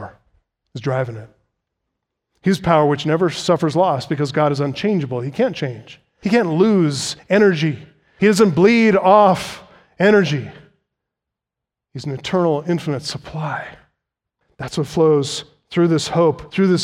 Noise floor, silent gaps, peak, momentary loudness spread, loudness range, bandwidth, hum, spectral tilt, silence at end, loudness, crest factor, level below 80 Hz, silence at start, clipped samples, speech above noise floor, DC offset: -85 dBFS; none; 0 dBFS; 16 LU; 9 LU; 14.5 kHz; none; -6 dB/octave; 0 s; -17 LUFS; 18 dB; -54 dBFS; 0 s; under 0.1%; 68 dB; under 0.1%